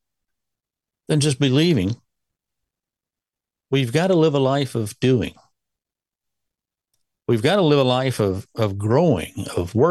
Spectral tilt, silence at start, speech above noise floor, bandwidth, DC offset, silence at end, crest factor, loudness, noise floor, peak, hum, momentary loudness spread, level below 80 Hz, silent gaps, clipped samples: -6 dB/octave; 1.1 s; 70 dB; 12.5 kHz; under 0.1%; 0 s; 18 dB; -20 LUFS; -88 dBFS; -4 dBFS; none; 9 LU; -54 dBFS; none; under 0.1%